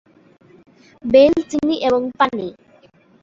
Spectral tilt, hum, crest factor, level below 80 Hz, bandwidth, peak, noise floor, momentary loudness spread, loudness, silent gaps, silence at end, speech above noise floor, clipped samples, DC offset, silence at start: -5.5 dB/octave; none; 18 dB; -52 dBFS; 7.6 kHz; -2 dBFS; -51 dBFS; 17 LU; -16 LUFS; none; 0.7 s; 36 dB; under 0.1%; under 0.1%; 1.05 s